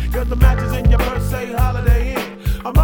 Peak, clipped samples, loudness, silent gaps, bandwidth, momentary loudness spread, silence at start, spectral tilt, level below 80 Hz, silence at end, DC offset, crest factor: 0 dBFS; under 0.1%; -18 LUFS; none; 18.5 kHz; 8 LU; 0 s; -6.5 dB/octave; -18 dBFS; 0 s; under 0.1%; 16 dB